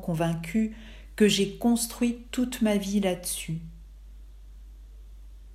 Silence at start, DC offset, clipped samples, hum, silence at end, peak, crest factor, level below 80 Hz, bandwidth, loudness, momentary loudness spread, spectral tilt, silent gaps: 0 s; under 0.1%; under 0.1%; none; 0 s; -10 dBFS; 18 dB; -46 dBFS; 15.5 kHz; -27 LUFS; 14 LU; -4.5 dB/octave; none